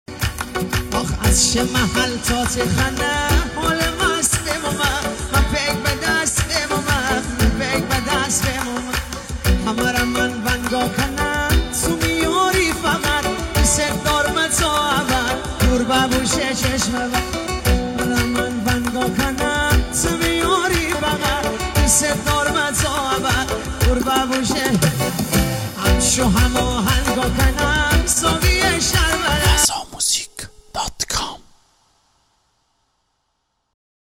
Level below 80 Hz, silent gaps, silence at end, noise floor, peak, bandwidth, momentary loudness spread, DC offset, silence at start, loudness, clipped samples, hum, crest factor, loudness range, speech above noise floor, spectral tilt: -26 dBFS; none; 2.7 s; -71 dBFS; -2 dBFS; 17 kHz; 6 LU; under 0.1%; 0.1 s; -18 LUFS; under 0.1%; none; 16 dB; 3 LU; 53 dB; -3.5 dB/octave